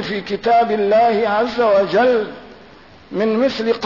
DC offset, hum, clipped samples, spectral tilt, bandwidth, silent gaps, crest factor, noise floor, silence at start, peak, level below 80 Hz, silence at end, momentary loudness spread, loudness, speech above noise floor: 0.2%; none; under 0.1%; -6 dB/octave; 6 kHz; none; 10 dB; -43 dBFS; 0 s; -6 dBFS; -54 dBFS; 0 s; 7 LU; -16 LUFS; 27 dB